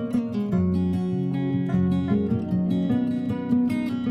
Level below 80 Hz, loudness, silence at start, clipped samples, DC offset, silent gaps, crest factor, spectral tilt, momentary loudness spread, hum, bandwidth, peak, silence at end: -56 dBFS; -24 LUFS; 0 s; under 0.1%; under 0.1%; none; 14 dB; -9.5 dB/octave; 3 LU; none; 10 kHz; -10 dBFS; 0 s